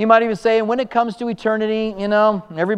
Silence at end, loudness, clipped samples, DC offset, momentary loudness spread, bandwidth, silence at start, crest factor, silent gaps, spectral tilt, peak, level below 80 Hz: 0 s; -18 LUFS; under 0.1%; under 0.1%; 7 LU; 9.8 kHz; 0 s; 16 dB; none; -6.5 dB/octave; 0 dBFS; -54 dBFS